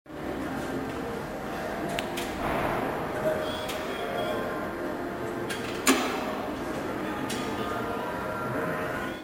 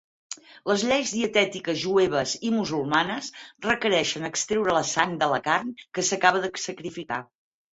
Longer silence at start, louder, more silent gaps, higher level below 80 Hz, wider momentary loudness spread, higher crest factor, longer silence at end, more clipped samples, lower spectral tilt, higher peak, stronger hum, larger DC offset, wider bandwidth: second, 0.05 s vs 0.3 s; second, -31 LUFS vs -25 LUFS; neither; first, -50 dBFS vs -62 dBFS; second, 6 LU vs 11 LU; about the same, 26 dB vs 22 dB; second, 0 s vs 0.5 s; neither; about the same, -4 dB/octave vs -3 dB/octave; second, -6 dBFS vs -2 dBFS; neither; neither; first, 16.5 kHz vs 8.2 kHz